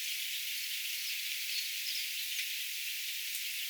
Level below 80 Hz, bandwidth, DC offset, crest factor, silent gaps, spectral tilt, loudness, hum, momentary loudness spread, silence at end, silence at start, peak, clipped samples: under -90 dBFS; over 20 kHz; under 0.1%; 16 dB; none; 12 dB/octave; -34 LUFS; none; 2 LU; 0 s; 0 s; -22 dBFS; under 0.1%